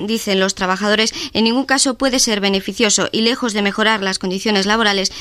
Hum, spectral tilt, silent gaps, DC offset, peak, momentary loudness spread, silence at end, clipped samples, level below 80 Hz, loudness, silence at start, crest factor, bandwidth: none; -2.5 dB/octave; none; under 0.1%; -2 dBFS; 4 LU; 0 s; under 0.1%; -46 dBFS; -16 LUFS; 0 s; 14 dB; 15.5 kHz